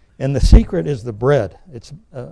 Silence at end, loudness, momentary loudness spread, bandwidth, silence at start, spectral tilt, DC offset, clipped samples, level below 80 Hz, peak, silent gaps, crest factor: 0 s; -17 LUFS; 24 LU; 11 kHz; 0.2 s; -7.5 dB/octave; under 0.1%; 1%; -18 dBFS; 0 dBFS; none; 16 dB